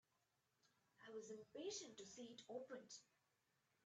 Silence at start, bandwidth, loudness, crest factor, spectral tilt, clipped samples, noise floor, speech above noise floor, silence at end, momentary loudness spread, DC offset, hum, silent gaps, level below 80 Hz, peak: 0.65 s; 9 kHz; -56 LUFS; 18 dB; -2.5 dB/octave; under 0.1%; -87 dBFS; 31 dB; 0.8 s; 9 LU; under 0.1%; none; none; under -90 dBFS; -40 dBFS